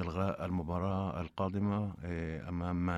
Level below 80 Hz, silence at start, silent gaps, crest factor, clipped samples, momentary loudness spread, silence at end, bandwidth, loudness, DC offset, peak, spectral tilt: -52 dBFS; 0 s; none; 14 dB; under 0.1%; 5 LU; 0 s; 7.8 kHz; -36 LUFS; under 0.1%; -20 dBFS; -9 dB/octave